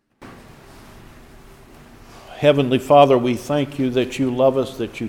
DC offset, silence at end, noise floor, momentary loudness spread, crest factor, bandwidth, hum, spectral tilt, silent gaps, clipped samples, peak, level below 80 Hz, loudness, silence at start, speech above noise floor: under 0.1%; 0 s; -44 dBFS; 10 LU; 20 dB; 16.5 kHz; none; -6.5 dB/octave; none; under 0.1%; 0 dBFS; -50 dBFS; -18 LUFS; 0.2 s; 27 dB